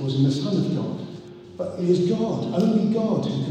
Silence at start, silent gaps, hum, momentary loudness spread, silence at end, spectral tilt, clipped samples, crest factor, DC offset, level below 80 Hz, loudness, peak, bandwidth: 0 s; none; none; 13 LU; 0 s; -8 dB/octave; under 0.1%; 14 dB; under 0.1%; -62 dBFS; -23 LUFS; -8 dBFS; 9.4 kHz